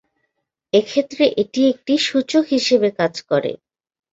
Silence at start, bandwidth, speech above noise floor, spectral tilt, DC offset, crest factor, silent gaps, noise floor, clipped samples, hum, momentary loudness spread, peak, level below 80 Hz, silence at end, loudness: 0.75 s; 8 kHz; 56 dB; -4.5 dB/octave; under 0.1%; 16 dB; none; -74 dBFS; under 0.1%; none; 5 LU; -4 dBFS; -62 dBFS; 0.6 s; -18 LUFS